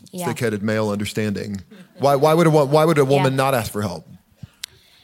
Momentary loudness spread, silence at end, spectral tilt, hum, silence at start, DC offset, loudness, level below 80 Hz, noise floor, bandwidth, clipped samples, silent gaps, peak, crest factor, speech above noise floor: 20 LU; 0.85 s; -6 dB/octave; none; 0.15 s; under 0.1%; -19 LUFS; -56 dBFS; -44 dBFS; 17 kHz; under 0.1%; none; -2 dBFS; 16 dB; 25 dB